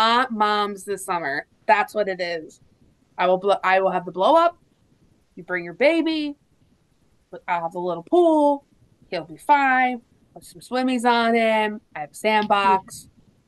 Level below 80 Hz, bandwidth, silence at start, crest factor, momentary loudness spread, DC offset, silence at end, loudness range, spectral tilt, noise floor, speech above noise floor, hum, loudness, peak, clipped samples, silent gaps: -66 dBFS; 12.5 kHz; 0 s; 18 dB; 14 LU; under 0.1%; 0.45 s; 3 LU; -4.5 dB/octave; -62 dBFS; 41 dB; none; -21 LUFS; -4 dBFS; under 0.1%; none